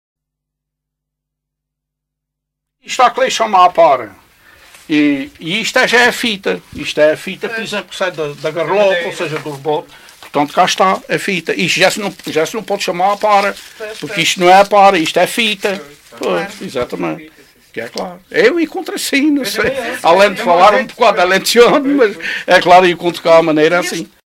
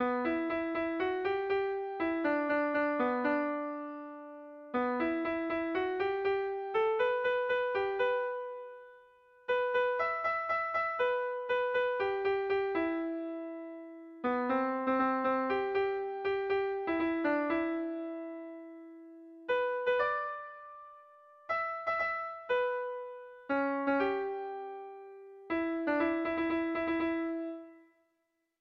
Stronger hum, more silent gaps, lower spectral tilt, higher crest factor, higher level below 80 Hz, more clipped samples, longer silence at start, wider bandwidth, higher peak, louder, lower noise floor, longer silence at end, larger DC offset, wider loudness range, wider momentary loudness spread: neither; neither; second, -3.5 dB/octave vs -6.5 dB/octave; about the same, 14 dB vs 14 dB; first, -52 dBFS vs -68 dBFS; neither; first, 2.85 s vs 0 s; first, 16.5 kHz vs 6 kHz; first, 0 dBFS vs -18 dBFS; first, -13 LUFS vs -33 LUFS; about the same, -78 dBFS vs -81 dBFS; second, 0.2 s vs 0.8 s; neither; first, 7 LU vs 3 LU; second, 13 LU vs 16 LU